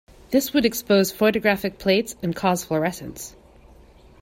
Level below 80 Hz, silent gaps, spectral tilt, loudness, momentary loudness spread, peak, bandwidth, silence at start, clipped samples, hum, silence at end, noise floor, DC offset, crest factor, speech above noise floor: -52 dBFS; none; -4.5 dB/octave; -22 LUFS; 14 LU; -6 dBFS; 16.5 kHz; 0.3 s; under 0.1%; none; 0.9 s; -49 dBFS; under 0.1%; 18 dB; 28 dB